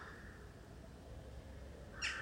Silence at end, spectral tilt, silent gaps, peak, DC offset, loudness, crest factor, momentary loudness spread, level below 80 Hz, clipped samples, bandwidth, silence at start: 0 s; -3 dB/octave; none; -26 dBFS; under 0.1%; -51 LUFS; 22 dB; 13 LU; -56 dBFS; under 0.1%; 16 kHz; 0 s